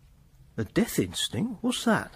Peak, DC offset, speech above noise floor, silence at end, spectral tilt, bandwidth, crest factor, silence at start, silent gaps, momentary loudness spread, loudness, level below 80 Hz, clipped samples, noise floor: -12 dBFS; under 0.1%; 28 dB; 0.05 s; -4.5 dB/octave; 15.5 kHz; 16 dB; 0.55 s; none; 8 LU; -28 LUFS; -54 dBFS; under 0.1%; -56 dBFS